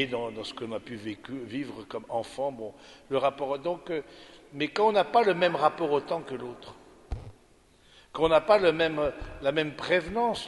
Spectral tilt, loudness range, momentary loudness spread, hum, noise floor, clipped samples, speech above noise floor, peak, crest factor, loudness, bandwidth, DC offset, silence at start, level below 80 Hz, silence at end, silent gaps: -5.5 dB/octave; 6 LU; 19 LU; none; -60 dBFS; under 0.1%; 32 dB; -8 dBFS; 20 dB; -28 LUFS; 11.5 kHz; under 0.1%; 0 s; -52 dBFS; 0 s; none